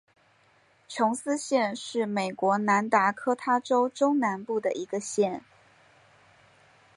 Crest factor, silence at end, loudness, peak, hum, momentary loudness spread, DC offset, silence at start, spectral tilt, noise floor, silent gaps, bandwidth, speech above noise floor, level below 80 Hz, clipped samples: 20 dB; 1.55 s; -27 LUFS; -8 dBFS; none; 7 LU; under 0.1%; 0.9 s; -4.5 dB/octave; -63 dBFS; none; 11.5 kHz; 37 dB; -78 dBFS; under 0.1%